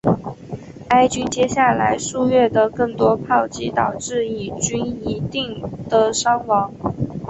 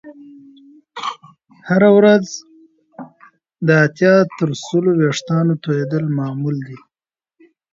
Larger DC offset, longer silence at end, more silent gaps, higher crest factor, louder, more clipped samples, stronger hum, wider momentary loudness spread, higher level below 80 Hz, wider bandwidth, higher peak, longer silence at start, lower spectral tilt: neither; second, 0 s vs 1 s; neither; about the same, 16 dB vs 18 dB; second, -19 LUFS vs -16 LUFS; neither; neither; second, 9 LU vs 22 LU; first, -46 dBFS vs -64 dBFS; about the same, 8.4 kHz vs 7.8 kHz; about the same, -2 dBFS vs 0 dBFS; about the same, 0.05 s vs 0.05 s; second, -4.5 dB/octave vs -6.5 dB/octave